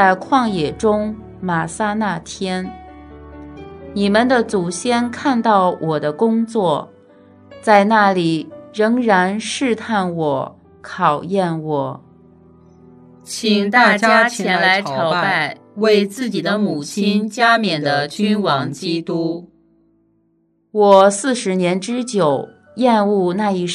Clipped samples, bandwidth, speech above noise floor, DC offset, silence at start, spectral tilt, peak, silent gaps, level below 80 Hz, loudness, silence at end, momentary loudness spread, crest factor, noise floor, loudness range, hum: under 0.1%; 13 kHz; 45 dB; under 0.1%; 0 s; -5 dB/octave; 0 dBFS; none; -54 dBFS; -17 LUFS; 0 s; 12 LU; 18 dB; -61 dBFS; 6 LU; none